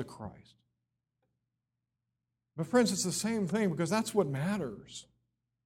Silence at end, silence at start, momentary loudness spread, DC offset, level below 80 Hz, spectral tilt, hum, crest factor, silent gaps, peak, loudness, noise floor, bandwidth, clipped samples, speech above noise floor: 0.65 s; 0 s; 19 LU; under 0.1%; -68 dBFS; -5 dB/octave; none; 20 dB; none; -14 dBFS; -31 LUFS; -87 dBFS; 16.5 kHz; under 0.1%; 55 dB